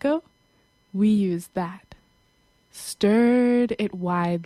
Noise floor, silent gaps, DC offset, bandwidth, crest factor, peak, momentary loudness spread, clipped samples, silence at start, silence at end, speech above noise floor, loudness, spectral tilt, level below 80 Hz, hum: -63 dBFS; none; under 0.1%; 14 kHz; 16 dB; -8 dBFS; 15 LU; under 0.1%; 0.05 s; 0 s; 41 dB; -23 LUFS; -6.5 dB/octave; -60 dBFS; none